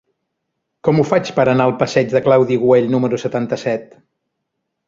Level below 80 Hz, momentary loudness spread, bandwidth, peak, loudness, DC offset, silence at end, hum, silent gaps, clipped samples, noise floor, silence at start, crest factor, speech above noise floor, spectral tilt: -56 dBFS; 7 LU; 7.6 kHz; 0 dBFS; -16 LUFS; under 0.1%; 1.05 s; none; none; under 0.1%; -75 dBFS; 0.85 s; 16 dB; 60 dB; -7 dB/octave